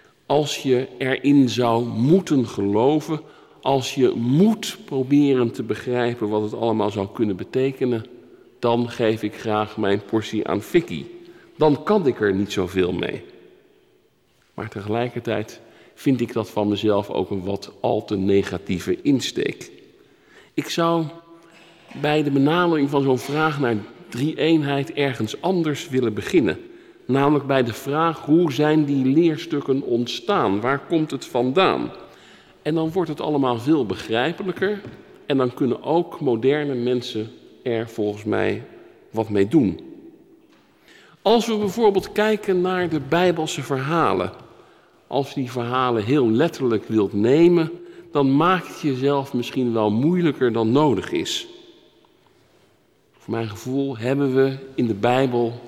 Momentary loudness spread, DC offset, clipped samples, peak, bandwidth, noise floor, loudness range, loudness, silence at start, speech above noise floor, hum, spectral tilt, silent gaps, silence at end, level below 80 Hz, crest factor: 9 LU; under 0.1%; under 0.1%; -6 dBFS; 15 kHz; -61 dBFS; 5 LU; -21 LUFS; 0.3 s; 41 dB; none; -6.5 dB/octave; none; 0 s; -60 dBFS; 16 dB